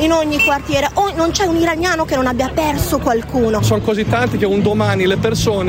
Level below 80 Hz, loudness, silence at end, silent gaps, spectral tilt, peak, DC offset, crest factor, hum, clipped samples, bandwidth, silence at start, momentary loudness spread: -32 dBFS; -15 LUFS; 0 s; none; -5 dB/octave; -2 dBFS; under 0.1%; 14 dB; none; under 0.1%; 16.5 kHz; 0 s; 3 LU